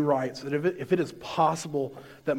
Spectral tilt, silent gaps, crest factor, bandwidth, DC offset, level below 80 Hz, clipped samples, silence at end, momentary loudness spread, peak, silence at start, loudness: -6 dB/octave; none; 18 dB; 16.5 kHz; under 0.1%; -66 dBFS; under 0.1%; 0 s; 7 LU; -10 dBFS; 0 s; -28 LUFS